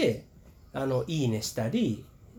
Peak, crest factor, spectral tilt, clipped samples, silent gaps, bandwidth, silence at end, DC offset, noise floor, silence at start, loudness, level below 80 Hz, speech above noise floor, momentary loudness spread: -14 dBFS; 16 dB; -5.5 dB/octave; under 0.1%; none; 19.5 kHz; 0 s; under 0.1%; -54 dBFS; 0 s; -31 LUFS; -56 dBFS; 25 dB; 10 LU